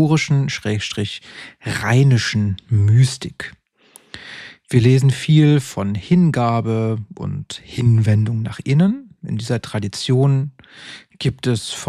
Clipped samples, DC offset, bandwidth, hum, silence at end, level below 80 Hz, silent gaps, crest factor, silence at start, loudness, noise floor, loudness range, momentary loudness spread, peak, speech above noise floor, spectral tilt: under 0.1%; under 0.1%; 12.5 kHz; none; 0 s; -50 dBFS; none; 16 dB; 0 s; -18 LUFS; -50 dBFS; 3 LU; 18 LU; -2 dBFS; 33 dB; -6.5 dB/octave